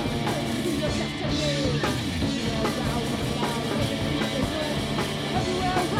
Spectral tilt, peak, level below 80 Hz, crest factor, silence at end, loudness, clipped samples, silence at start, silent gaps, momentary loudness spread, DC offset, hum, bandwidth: -5 dB/octave; -12 dBFS; -40 dBFS; 14 dB; 0 s; -26 LUFS; under 0.1%; 0 s; none; 2 LU; under 0.1%; none; 16 kHz